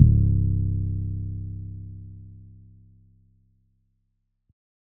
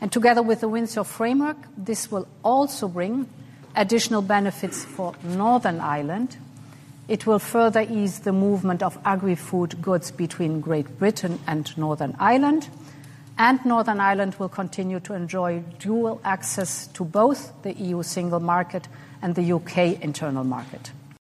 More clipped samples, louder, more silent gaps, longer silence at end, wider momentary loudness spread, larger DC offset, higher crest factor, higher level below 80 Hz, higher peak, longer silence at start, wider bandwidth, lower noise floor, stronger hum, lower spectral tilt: neither; about the same, -26 LUFS vs -24 LUFS; neither; first, 2.55 s vs 0.05 s; first, 24 LU vs 11 LU; neither; first, 26 dB vs 18 dB; first, -32 dBFS vs -66 dBFS; first, 0 dBFS vs -4 dBFS; about the same, 0 s vs 0 s; second, 0.7 kHz vs 13.5 kHz; first, -74 dBFS vs -44 dBFS; neither; first, -22 dB/octave vs -5.5 dB/octave